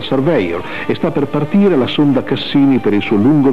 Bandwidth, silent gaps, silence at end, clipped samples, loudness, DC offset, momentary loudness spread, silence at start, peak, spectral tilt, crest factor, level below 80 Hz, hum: 6.2 kHz; none; 0 s; under 0.1%; -14 LUFS; 3%; 6 LU; 0 s; -2 dBFS; -8.5 dB/octave; 12 dB; -48 dBFS; none